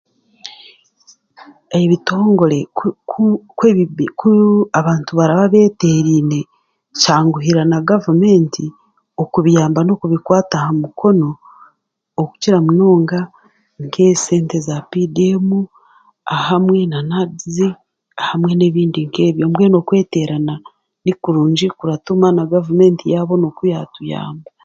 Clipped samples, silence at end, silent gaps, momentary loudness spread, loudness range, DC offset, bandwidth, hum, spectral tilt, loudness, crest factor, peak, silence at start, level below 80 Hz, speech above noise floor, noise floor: under 0.1%; 0.25 s; none; 13 LU; 4 LU; under 0.1%; 7.8 kHz; none; -6.5 dB/octave; -14 LUFS; 14 dB; 0 dBFS; 0.45 s; -56 dBFS; 46 dB; -59 dBFS